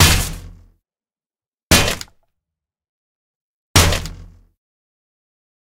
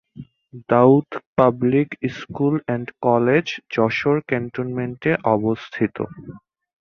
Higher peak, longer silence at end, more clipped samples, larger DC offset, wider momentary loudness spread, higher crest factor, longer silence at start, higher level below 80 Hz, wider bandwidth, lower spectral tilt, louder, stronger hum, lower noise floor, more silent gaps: about the same, 0 dBFS vs -2 dBFS; first, 1.45 s vs 0.45 s; neither; neither; first, 21 LU vs 11 LU; about the same, 22 dB vs 20 dB; second, 0 s vs 0.15 s; first, -32 dBFS vs -56 dBFS; first, 18 kHz vs 6.8 kHz; second, -3 dB/octave vs -8 dB/octave; first, -16 LUFS vs -20 LUFS; neither; first, under -90 dBFS vs -42 dBFS; first, 1.48-1.52 s, 1.63-1.70 s, 2.89-3.74 s vs 1.26-1.33 s